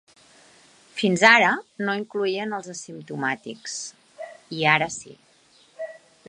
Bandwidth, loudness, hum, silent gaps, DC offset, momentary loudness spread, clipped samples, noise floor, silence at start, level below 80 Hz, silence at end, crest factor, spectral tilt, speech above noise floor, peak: 11 kHz; -22 LUFS; none; none; under 0.1%; 22 LU; under 0.1%; -58 dBFS; 0.95 s; -72 dBFS; 0.3 s; 24 dB; -3.5 dB/octave; 35 dB; 0 dBFS